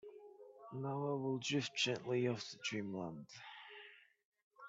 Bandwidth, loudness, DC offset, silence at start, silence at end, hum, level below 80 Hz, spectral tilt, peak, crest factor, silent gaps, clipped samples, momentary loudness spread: 8 kHz; -40 LUFS; under 0.1%; 0.05 s; 0 s; none; -84 dBFS; -4.5 dB/octave; -22 dBFS; 20 dB; 4.25-4.32 s, 4.44-4.51 s; under 0.1%; 20 LU